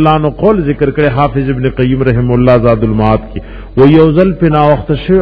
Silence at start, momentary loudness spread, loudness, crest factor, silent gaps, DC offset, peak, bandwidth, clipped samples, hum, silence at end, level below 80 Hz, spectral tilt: 0 s; 7 LU; -10 LUFS; 8 dB; none; under 0.1%; 0 dBFS; 5.4 kHz; 1%; none; 0 s; -26 dBFS; -11 dB/octave